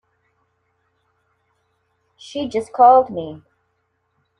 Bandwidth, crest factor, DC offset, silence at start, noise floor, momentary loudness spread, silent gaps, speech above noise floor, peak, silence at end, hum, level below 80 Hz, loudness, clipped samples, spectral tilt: 10.5 kHz; 20 dB; under 0.1%; 2.3 s; -69 dBFS; 21 LU; none; 53 dB; -2 dBFS; 1.05 s; 60 Hz at -65 dBFS; -64 dBFS; -16 LUFS; under 0.1%; -5.5 dB/octave